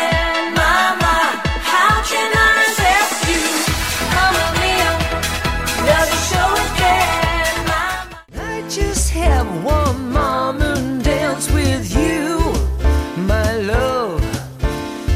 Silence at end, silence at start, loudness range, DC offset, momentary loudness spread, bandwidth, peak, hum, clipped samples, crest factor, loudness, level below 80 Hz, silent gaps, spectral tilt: 0 s; 0 s; 4 LU; under 0.1%; 8 LU; 16.5 kHz; -2 dBFS; none; under 0.1%; 14 dB; -16 LUFS; -24 dBFS; none; -4 dB/octave